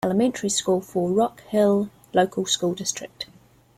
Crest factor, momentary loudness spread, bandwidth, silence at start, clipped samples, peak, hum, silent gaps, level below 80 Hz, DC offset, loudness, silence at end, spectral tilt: 18 dB; 11 LU; 16 kHz; 0.05 s; under 0.1%; -6 dBFS; none; none; -62 dBFS; under 0.1%; -23 LUFS; 0.5 s; -4 dB/octave